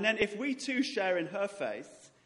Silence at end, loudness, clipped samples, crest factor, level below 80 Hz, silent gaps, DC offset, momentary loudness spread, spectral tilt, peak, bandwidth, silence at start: 0.2 s; -33 LUFS; under 0.1%; 22 dB; -70 dBFS; none; under 0.1%; 9 LU; -4 dB/octave; -12 dBFS; 11.5 kHz; 0 s